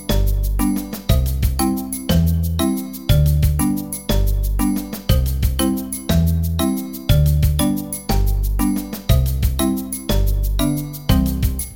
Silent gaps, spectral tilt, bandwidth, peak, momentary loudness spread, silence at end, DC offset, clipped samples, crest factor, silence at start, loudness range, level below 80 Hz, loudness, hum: none; -6 dB/octave; 17 kHz; -2 dBFS; 5 LU; 0 s; 0.2%; under 0.1%; 16 dB; 0 s; 1 LU; -22 dBFS; -19 LUFS; none